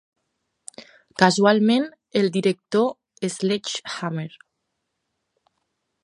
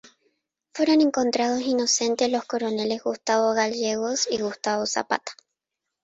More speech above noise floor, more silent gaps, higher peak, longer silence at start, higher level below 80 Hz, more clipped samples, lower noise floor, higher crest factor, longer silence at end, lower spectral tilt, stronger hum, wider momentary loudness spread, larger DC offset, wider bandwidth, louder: second, 57 dB vs 61 dB; neither; first, 0 dBFS vs -6 dBFS; about the same, 0.8 s vs 0.75 s; about the same, -72 dBFS vs -68 dBFS; neither; second, -78 dBFS vs -84 dBFS; about the same, 24 dB vs 20 dB; first, 1.75 s vs 0.7 s; first, -5 dB/octave vs -2.5 dB/octave; neither; first, 21 LU vs 7 LU; neither; first, 11 kHz vs 8.2 kHz; about the same, -22 LUFS vs -24 LUFS